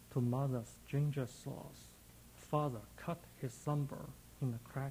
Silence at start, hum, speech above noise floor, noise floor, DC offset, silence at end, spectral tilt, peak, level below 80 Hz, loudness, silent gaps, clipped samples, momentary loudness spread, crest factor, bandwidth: 0 s; none; 20 dB; -59 dBFS; under 0.1%; 0 s; -7.5 dB/octave; -22 dBFS; -64 dBFS; -41 LUFS; none; under 0.1%; 18 LU; 20 dB; 16.5 kHz